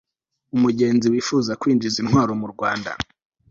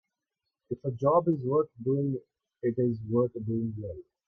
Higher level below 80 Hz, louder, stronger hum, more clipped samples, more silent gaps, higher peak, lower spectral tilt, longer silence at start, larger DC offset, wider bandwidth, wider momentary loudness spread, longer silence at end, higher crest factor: first, -52 dBFS vs -64 dBFS; first, -20 LUFS vs -29 LUFS; neither; neither; neither; first, -4 dBFS vs -12 dBFS; second, -5.5 dB/octave vs -12 dB/octave; second, 0.55 s vs 0.7 s; neither; first, 7.8 kHz vs 6.2 kHz; second, 9 LU vs 12 LU; first, 0.45 s vs 0.25 s; about the same, 16 dB vs 18 dB